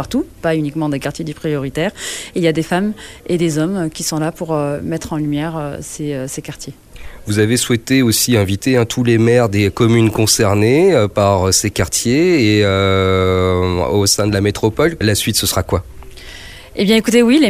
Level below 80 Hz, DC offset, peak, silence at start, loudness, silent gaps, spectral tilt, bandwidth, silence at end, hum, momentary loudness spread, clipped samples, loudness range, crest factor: -38 dBFS; 0.1%; 0 dBFS; 0 s; -15 LUFS; none; -4.5 dB/octave; 16 kHz; 0 s; none; 12 LU; under 0.1%; 7 LU; 14 dB